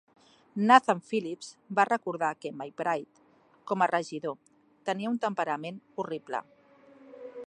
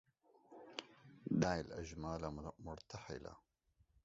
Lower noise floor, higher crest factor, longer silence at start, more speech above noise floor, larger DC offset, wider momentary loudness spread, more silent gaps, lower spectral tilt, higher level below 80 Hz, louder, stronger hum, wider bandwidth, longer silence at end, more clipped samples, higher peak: second, -57 dBFS vs -76 dBFS; about the same, 26 dB vs 24 dB; about the same, 0.55 s vs 0.5 s; second, 28 dB vs 32 dB; neither; second, 18 LU vs 22 LU; neither; about the same, -5 dB/octave vs -5.5 dB/octave; second, -84 dBFS vs -62 dBFS; first, -29 LUFS vs -45 LUFS; neither; first, 10.5 kHz vs 7.6 kHz; second, 0 s vs 0.65 s; neither; first, -4 dBFS vs -22 dBFS